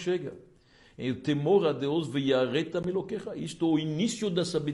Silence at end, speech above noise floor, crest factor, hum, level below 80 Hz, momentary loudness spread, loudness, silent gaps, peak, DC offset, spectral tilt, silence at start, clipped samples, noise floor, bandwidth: 0 s; 31 dB; 16 dB; none; -66 dBFS; 11 LU; -29 LUFS; none; -12 dBFS; under 0.1%; -6 dB/octave; 0 s; under 0.1%; -59 dBFS; 11.5 kHz